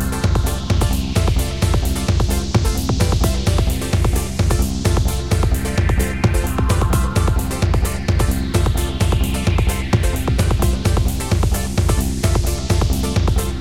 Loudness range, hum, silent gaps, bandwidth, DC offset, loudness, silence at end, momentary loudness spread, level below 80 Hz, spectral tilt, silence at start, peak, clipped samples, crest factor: 0 LU; none; none; 17 kHz; 1%; -19 LUFS; 0 s; 2 LU; -20 dBFS; -5.5 dB/octave; 0 s; -2 dBFS; under 0.1%; 14 dB